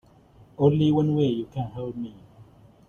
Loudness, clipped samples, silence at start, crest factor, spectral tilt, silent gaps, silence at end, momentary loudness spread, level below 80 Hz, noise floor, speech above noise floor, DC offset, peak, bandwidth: -24 LUFS; under 0.1%; 0.6 s; 20 dB; -9.5 dB/octave; none; 0.45 s; 14 LU; -56 dBFS; -54 dBFS; 30 dB; under 0.1%; -6 dBFS; 6.8 kHz